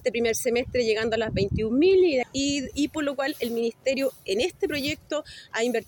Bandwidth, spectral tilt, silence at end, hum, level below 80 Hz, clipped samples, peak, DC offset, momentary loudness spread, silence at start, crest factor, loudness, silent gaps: 19 kHz; -4.5 dB/octave; 0.05 s; none; -48 dBFS; under 0.1%; -10 dBFS; under 0.1%; 8 LU; 0.05 s; 14 dB; -25 LUFS; none